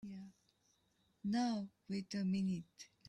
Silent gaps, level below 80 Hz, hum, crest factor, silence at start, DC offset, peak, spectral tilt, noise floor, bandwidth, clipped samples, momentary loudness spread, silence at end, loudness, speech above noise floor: none; -78 dBFS; none; 14 dB; 0.05 s; under 0.1%; -28 dBFS; -6 dB/octave; -78 dBFS; 9.8 kHz; under 0.1%; 17 LU; 0.25 s; -41 LUFS; 38 dB